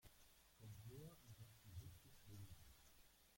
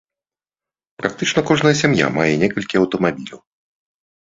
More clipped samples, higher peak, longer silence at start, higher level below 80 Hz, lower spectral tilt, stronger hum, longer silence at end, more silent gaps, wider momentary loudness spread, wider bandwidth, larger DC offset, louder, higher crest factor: neither; second, -46 dBFS vs 0 dBFS; second, 0 s vs 1 s; second, -74 dBFS vs -52 dBFS; about the same, -5 dB/octave vs -5 dB/octave; neither; second, 0 s vs 0.95 s; neither; second, 7 LU vs 10 LU; first, 16.5 kHz vs 7.8 kHz; neither; second, -63 LUFS vs -17 LUFS; about the same, 16 dB vs 20 dB